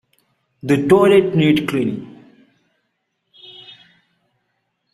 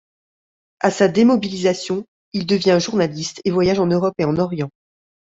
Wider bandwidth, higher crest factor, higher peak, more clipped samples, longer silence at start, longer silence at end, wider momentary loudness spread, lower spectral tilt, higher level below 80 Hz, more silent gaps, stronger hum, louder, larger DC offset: first, 13.5 kHz vs 8 kHz; about the same, 18 dB vs 18 dB; about the same, -2 dBFS vs -2 dBFS; neither; second, 0.65 s vs 0.85 s; first, 2.85 s vs 0.7 s; first, 26 LU vs 11 LU; first, -7 dB/octave vs -5.5 dB/octave; about the same, -56 dBFS vs -54 dBFS; second, none vs 2.08-2.32 s; neither; first, -15 LUFS vs -19 LUFS; neither